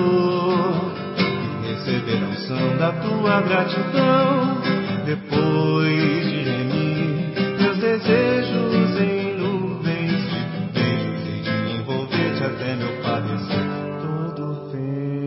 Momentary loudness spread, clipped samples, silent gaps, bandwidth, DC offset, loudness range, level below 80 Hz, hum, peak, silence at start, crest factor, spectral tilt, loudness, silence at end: 8 LU; under 0.1%; none; 5.8 kHz; under 0.1%; 4 LU; -54 dBFS; none; -4 dBFS; 0 s; 18 dB; -11 dB/octave; -21 LUFS; 0 s